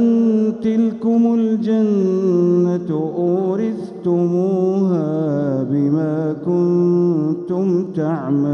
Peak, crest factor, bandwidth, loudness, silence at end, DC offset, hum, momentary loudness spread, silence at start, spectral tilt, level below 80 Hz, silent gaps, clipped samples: -6 dBFS; 10 dB; 6.8 kHz; -18 LUFS; 0 s; under 0.1%; none; 5 LU; 0 s; -10 dB/octave; -64 dBFS; none; under 0.1%